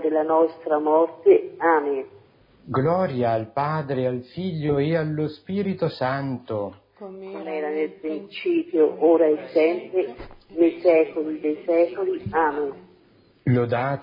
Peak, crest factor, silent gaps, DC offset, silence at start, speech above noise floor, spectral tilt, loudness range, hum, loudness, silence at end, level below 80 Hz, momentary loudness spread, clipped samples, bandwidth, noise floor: -6 dBFS; 18 dB; none; under 0.1%; 0 s; 35 dB; -10.5 dB/octave; 5 LU; none; -23 LUFS; 0 s; -58 dBFS; 12 LU; under 0.1%; 5.4 kHz; -57 dBFS